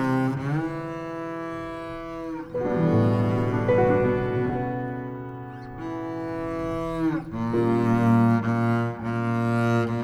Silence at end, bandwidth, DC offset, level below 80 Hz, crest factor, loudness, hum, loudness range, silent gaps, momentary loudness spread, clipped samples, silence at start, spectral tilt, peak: 0 s; 10.5 kHz; under 0.1%; -48 dBFS; 16 dB; -25 LUFS; none; 5 LU; none; 13 LU; under 0.1%; 0 s; -9 dB/octave; -8 dBFS